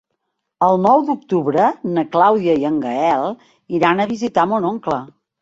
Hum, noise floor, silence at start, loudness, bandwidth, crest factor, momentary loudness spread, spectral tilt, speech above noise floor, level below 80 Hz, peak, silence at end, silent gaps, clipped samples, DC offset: none; -74 dBFS; 0.6 s; -17 LUFS; 7.8 kHz; 16 dB; 9 LU; -7 dB/octave; 58 dB; -60 dBFS; -2 dBFS; 0.35 s; none; under 0.1%; under 0.1%